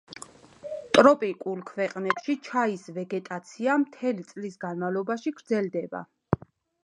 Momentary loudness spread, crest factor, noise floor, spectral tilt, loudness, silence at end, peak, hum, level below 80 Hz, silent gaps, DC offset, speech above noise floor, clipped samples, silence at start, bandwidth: 18 LU; 26 dB; -46 dBFS; -5.5 dB/octave; -27 LUFS; 0.5 s; -2 dBFS; none; -60 dBFS; none; under 0.1%; 19 dB; under 0.1%; 0.1 s; 11 kHz